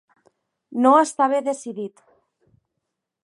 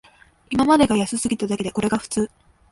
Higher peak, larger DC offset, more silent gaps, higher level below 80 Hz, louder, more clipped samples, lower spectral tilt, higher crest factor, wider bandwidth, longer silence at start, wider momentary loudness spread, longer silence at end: about the same, -2 dBFS vs -4 dBFS; neither; neither; second, -82 dBFS vs -48 dBFS; about the same, -20 LUFS vs -21 LUFS; neither; about the same, -4.5 dB/octave vs -4.5 dB/octave; about the same, 20 dB vs 18 dB; about the same, 11.5 kHz vs 11.5 kHz; first, 0.7 s vs 0.5 s; first, 17 LU vs 9 LU; first, 1.35 s vs 0.45 s